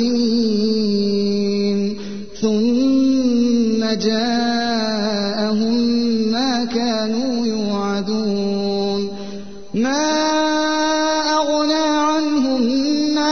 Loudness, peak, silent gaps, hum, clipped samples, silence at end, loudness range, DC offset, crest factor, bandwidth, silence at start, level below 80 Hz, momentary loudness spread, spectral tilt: -18 LUFS; -6 dBFS; none; none; under 0.1%; 0 s; 3 LU; 2%; 12 dB; 6.6 kHz; 0 s; -52 dBFS; 5 LU; -4.5 dB/octave